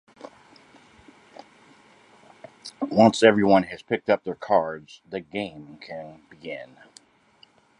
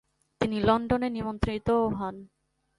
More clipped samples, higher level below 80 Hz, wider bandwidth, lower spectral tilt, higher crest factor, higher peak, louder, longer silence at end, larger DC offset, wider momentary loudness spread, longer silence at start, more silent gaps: neither; second, -64 dBFS vs -44 dBFS; about the same, 11 kHz vs 11.5 kHz; second, -5.5 dB/octave vs -7.5 dB/octave; about the same, 24 dB vs 20 dB; first, -2 dBFS vs -10 dBFS; first, -22 LUFS vs -28 LUFS; first, 1.15 s vs 0.55 s; neither; first, 25 LU vs 10 LU; second, 0.25 s vs 0.4 s; neither